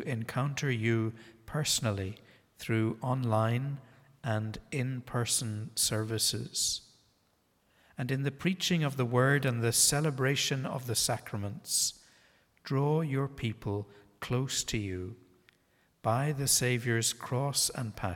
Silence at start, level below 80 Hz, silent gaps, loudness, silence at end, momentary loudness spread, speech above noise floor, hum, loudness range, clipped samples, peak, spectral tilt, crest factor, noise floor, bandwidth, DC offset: 0 s; -60 dBFS; none; -31 LUFS; 0 s; 12 LU; 41 dB; none; 5 LU; under 0.1%; -12 dBFS; -4 dB/octave; 20 dB; -72 dBFS; 18 kHz; under 0.1%